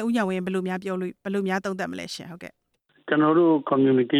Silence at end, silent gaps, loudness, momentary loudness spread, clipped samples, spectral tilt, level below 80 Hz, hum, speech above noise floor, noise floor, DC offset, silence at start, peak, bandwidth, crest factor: 0 s; none; -24 LUFS; 18 LU; under 0.1%; -6.5 dB/octave; -70 dBFS; none; 22 dB; -45 dBFS; under 0.1%; 0 s; -10 dBFS; 13.5 kHz; 14 dB